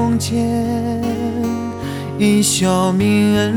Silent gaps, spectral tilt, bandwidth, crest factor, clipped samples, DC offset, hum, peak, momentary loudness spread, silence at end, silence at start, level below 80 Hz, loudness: none; -5 dB/octave; 17.5 kHz; 12 dB; under 0.1%; under 0.1%; none; -4 dBFS; 9 LU; 0 s; 0 s; -44 dBFS; -17 LUFS